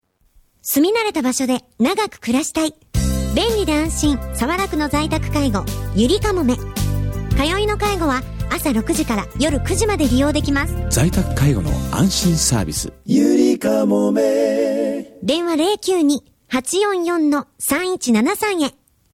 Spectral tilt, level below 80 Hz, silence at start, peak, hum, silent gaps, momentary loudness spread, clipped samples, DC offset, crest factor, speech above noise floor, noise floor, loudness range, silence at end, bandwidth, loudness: -5 dB/octave; -30 dBFS; 0.65 s; -4 dBFS; none; none; 6 LU; under 0.1%; under 0.1%; 14 dB; 38 dB; -55 dBFS; 3 LU; 0.45 s; 17.5 kHz; -18 LUFS